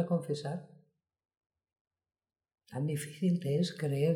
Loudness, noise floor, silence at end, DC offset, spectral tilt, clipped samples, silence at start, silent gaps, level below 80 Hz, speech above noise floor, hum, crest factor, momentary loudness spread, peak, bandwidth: -34 LUFS; -68 dBFS; 0 s; under 0.1%; -7 dB/octave; under 0.1%; 0 s; 1.81-1.91 s; -76 dBFS; 36 dB; none; 18 dB; 10 LU; -18 dBFS; 15.5 kHz